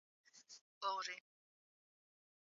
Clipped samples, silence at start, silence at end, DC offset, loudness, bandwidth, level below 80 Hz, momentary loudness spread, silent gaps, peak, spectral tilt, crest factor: under 0.1%; 0.35 s; 1.35 s; under 0.1%; -45 LUFS; 7.4 kHz; under -90 dBFS; 23 LU; 0.61-0.81 s; -30 dBFS; 3.5 dB/octave; 22 dB